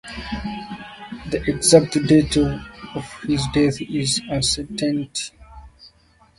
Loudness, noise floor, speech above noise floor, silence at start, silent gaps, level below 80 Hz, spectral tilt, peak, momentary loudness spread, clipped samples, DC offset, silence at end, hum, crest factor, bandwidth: -20 LUFS; -55 dBFS; 35 dB; 0.05 s; none; -40 dBFS; -4.5 dB/octave; 0 dBFS; 18 LU; under 0.1%; under 0.1%; 0.5 s; none; 22 dB; 11.5 kHz